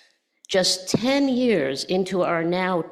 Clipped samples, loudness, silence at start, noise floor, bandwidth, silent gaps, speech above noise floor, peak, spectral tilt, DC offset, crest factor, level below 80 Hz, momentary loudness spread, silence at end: under 0.1%; -22 LUFS; 0.5 s; -54 dBFS; 14 kHz; none; 32 dB; -8 dBFS; -4 dB/octave; under 0.1%; 14 dB; -62 dBFS; 4 LU; 0 s